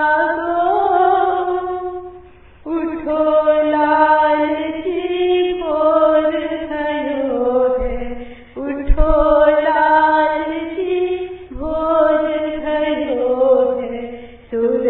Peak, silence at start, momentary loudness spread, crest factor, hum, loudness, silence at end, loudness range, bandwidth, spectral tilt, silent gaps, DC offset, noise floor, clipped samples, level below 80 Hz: 0 dBFS; 0 s; 14 LU; 16 dB; none; -16 LUFS; 0 s; 3 LU; 4.2 kHz; -9.5 dB/octave; none; under 0.1%; -42 dBFS; under 0.1%; -28 dBFS